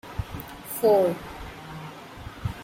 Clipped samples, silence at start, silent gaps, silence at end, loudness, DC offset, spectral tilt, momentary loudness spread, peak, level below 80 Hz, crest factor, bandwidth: under 0.1%; 0.05 s; none; 0 s; -26 LUFS; under 0.1%; -6 dB/octave; 20 LU; -10 dBFS; -46 dBFS; 18 dB; 16.5 kHz